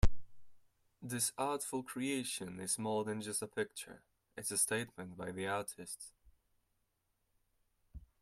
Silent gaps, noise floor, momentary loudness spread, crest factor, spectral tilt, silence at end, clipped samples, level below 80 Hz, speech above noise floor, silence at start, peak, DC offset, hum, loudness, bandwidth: none; -82 dBFS; 16 LU; 24 dB; -3.5 dB/octave; 0.2 s; under 0.1%; -48 dBFS; 42 dB; 0 s; -16 dBFS; under 0.1%; none; -39 LUFS; 15.5 kHz